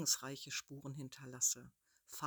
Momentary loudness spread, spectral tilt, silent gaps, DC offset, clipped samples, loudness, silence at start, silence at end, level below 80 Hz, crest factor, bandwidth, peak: 14 LU; -1.5 dB/octave; none; under 0.1%; under 0.1%; -40 LUFS; 0 s; 0 s; -80 dBFS; 22 dB; over 20 kHz; -20 dBFS